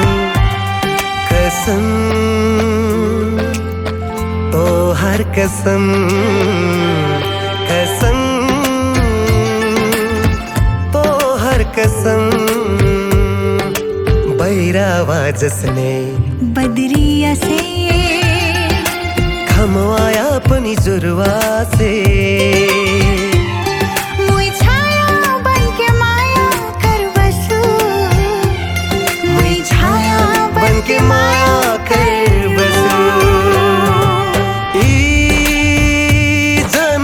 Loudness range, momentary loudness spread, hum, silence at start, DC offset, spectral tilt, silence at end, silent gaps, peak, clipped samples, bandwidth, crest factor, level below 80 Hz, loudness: 3 LU; 5 LU; none; 0 s; under 0.1%; -5 dB/octave; 0 s; none; 0 dBFS; under 0.1%; 19.5 kHz; 12 dB; -22 dBFS; -13 LUFS